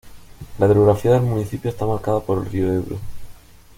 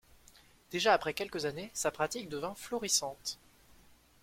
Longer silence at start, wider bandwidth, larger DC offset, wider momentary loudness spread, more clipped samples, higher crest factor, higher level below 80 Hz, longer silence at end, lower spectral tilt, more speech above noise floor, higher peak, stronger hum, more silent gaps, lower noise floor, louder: second, 0.05 s vs 0.7 s; about the same, 16.5 kHz vs 16.5 kHz; neither; first, 16 LU vs 12 LU; neither; second, 18 dB vs 24 dB; first, -42 dBFS vs -66 dBFS; second, 0.45 s vs 0.9 s; first, -8.5 dB/octave vs -2 dB/octave; second, 23 dB vs 28 dB; first, -2 dBFS vs -12 dBFS; neither; neither; second, -41 dBFS vs -62 dBFS; first, -19 LUFS vs -34 LUFS